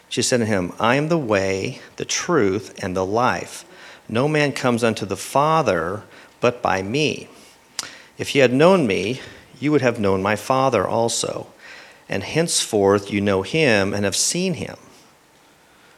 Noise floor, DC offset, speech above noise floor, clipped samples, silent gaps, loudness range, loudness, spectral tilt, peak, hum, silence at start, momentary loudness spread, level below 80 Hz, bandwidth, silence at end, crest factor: -53 dBFS; under 0.1%; 34 dB; under 0.1%; none; 3 LU; -20 LUFS; -4 dB/octave; 0 dBFS; none; 0.1 s; 15 LU; -60 dBFS; 15.5 kHz; 1.25 s; 20 dB